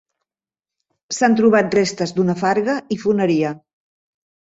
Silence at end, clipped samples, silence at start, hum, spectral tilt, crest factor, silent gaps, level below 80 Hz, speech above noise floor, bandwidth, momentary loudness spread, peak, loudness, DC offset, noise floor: 0.95 s; under 0.1%; 1.1 s; none; -5.5 dB/octave; 18 dB; none; -60 dBFS; over 73 dB; 8 kHz; 8 LU; -2 dBFS; -18 LUFS; under 0.1%; under -90 dBFS